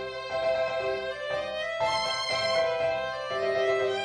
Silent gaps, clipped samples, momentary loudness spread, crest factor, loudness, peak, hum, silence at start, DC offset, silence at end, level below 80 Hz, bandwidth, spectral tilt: none; under 0.1%; 6 LU; 14 dB; -28 LUFS; -14 dBFS; none; 0 s; under 0.1%; 0 s; -60 dBFS; 10 kHz; -3 dB/octave